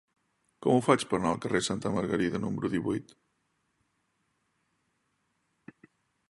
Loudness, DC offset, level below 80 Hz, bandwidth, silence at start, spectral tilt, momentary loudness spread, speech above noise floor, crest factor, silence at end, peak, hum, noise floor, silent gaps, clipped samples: -29 LUFS; under 0.1%; -62 dBFS; 11.5 kHz; 0.6 s; -5.5 dB/octave; 8 LU; 48 dB; 26 dB; 3.3 s; -6 dBFS; none; -76 dBFS; none; under 0.1%